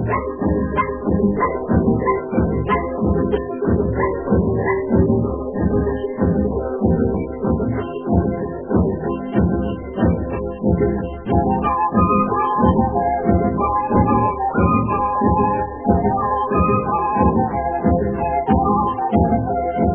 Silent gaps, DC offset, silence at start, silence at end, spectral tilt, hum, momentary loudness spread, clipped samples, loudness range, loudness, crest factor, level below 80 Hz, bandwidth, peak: none; 0.1%; 0 s; 0 s; -13 dB/octave; none; 5 LU; under 0.1%; 3 LU; -19 LUFS; 16 dB; -30 dBFS; 3.4 kHz; -2 dBFS